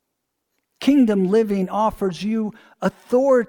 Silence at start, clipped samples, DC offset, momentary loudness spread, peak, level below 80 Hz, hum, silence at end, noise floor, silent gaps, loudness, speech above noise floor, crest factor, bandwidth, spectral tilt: 0.8 s; under 0.1%; under 0.1%; 10 LU; -6 dBFS; -52 dBFS; none; 0.05 s; -77 dBFS; none; -20 LUFS; 58 dB; 14 dB; 18.5 kHz; -7 dB/octave